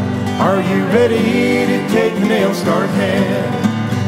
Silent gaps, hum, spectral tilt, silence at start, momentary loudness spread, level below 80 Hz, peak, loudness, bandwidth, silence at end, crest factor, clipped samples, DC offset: none; none; -6.5 dB/octave; 0 s; 4 LU; -54 dBFS; 0 dBFS; -15 LUFS; 16 kHz; 0 s; 14 dB; under 0.1%; 0.2%